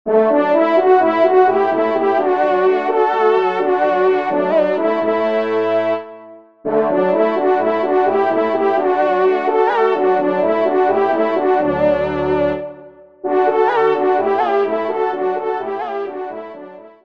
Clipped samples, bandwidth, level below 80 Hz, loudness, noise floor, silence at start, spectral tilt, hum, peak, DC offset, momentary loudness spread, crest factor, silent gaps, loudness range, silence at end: under 0.1%; 6 kHz; -52 dBFS; -16 LUFS; -40 dBFS; 0.05 s; -7.5 dB/octave; none; -2 dBFS; 0.4%; 9 LU; 14 dB; none; 3 LU; 0.15 s